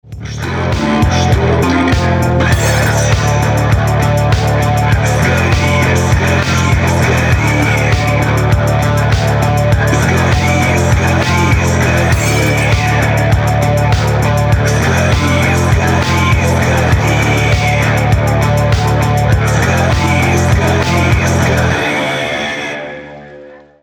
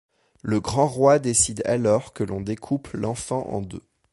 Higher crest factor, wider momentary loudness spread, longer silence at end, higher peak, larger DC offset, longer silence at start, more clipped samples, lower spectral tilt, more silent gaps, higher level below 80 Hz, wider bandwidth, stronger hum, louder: second, 10 dB vs 20 dB; second, 1 LU vs 13 LU; about the same, 0.25 s vs 0.35 s; first, 0 dBFS vs -4 dBFS; neither; second, 0.05 s vs 0.45 s; neither; about the same, -5.5 dB/octave vs -5 dB/octave; neither; first, -22 dBFS vs -48 dBFS; first, over 20 kHz vs 11.5 kHz; neither; first, -12 LUFS vs -23 LUFS